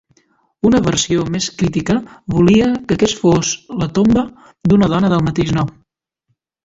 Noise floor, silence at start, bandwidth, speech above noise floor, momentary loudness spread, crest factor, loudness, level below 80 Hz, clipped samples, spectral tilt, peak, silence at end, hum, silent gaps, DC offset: -68 dBFS; 0.65 s; 7.8 kHz; 54 dB; 8 LU; 14 dB; -15 LUFS; -40 dBFS; under 0.1%; -5.5 dB/octave; -2 dBFS; 0.95 s; none; none; under 0.1%